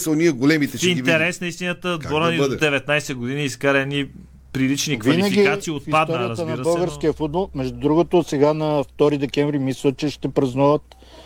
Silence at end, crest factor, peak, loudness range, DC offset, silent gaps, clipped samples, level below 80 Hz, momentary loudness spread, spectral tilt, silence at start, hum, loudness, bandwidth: 0 s; 16 dB; -4 dBFS; 1 LU; under 0.1%; none; under 0.1%; -48 dBFS; 7 LU; -5 dB/octave; 0 s; none; -20 LUFS; 18 kHz